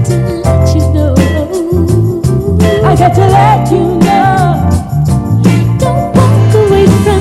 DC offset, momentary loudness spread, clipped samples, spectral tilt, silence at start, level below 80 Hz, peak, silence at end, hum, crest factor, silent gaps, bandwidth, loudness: under 0.1%; 5 LU; 1%; -7.5 dB/octave; 0 s; -22 dBFS; 0 dBFS; 0 s; none; 8 dB; none; 14 kHz; -9 LUFS